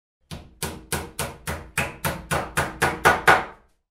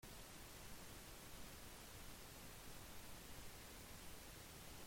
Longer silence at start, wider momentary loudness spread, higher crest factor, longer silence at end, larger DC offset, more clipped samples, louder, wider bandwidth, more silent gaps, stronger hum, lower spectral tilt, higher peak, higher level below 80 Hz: first, 0.3 s vs 0 s; first, 18 LU vs 0 LU; first, 24 dB vs 14 dB; first, 0.35 s vs 0 s; neither; neither; first, -23 LUFS vs -57 LUFS; about the same, 16 kHz vs 16.5 kHz; neither; neither; about the same, -3.5 dB/octave vs -3 dB/octave; first, -2 dBFS vs -42 dBFS; first, -44 dBFS vs -64 dBFS